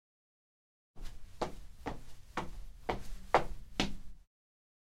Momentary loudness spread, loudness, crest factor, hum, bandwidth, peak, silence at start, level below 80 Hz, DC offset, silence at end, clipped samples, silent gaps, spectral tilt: 21 LU; -39 LUFS; 30 dB; none; 15 kHz; -10 dBFS; 0.95 s; -48 dBFS; under 0.1%; 0.6 s; under 0.1%; none; -4.5 dB/octave